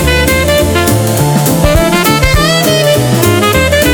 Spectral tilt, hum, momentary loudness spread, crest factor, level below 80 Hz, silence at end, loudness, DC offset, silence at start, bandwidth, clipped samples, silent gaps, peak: -4.5 dB/octave; none; 1 LU; 8 dB; -20 dBFS; 0 s; -9 LUFS; under 0.1%; 0 s; over 20 kHz; under 0.1%; none; 0 dBFS